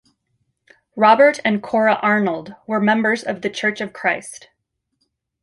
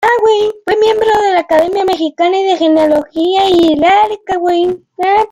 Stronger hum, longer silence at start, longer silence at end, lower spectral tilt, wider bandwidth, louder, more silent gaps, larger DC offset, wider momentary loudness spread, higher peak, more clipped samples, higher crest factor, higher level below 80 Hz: neither; first, 0.95 s vs 0 s; first, 1.05 s vs 0.05 s; about the same, -5 dB/octave vs -4.5 dB/octave; second, 11.5 kHz vs 15.5 kHz; second, -18 LUFS vs -11 LUFS; neither; neither; first, 12 LU vs 5 LU; about the same, -2 dBFS vs 0 dBFS; neither; first, 18 dB vs 10 dB; second, -66 dBFS vs -46 dBFS